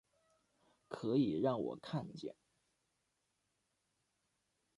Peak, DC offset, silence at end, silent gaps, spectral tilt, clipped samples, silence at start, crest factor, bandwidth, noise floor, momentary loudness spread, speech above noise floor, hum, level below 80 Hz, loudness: -22 dBFS; under 0.1%; 2.45 s; none; -8 dB/octave; under 0.1%; 0.9 s; 20 dB; 11.5 kHz; -84 dBFS; 16 LU; 46 dB; none; -78 dBFS; -39 LUFS